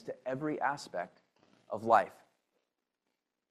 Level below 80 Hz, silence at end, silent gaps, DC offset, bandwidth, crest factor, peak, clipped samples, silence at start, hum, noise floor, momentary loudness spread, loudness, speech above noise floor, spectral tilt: -82 dBFS; 1.4 s; none; under 0.1%; 13.5 kHz; 24 dB; -12 dBFS; under 0.1%; 0.05 s; none; -86 dBFS; 15 LU; -34 LUFS; 53 dB; -5.5 dB/octave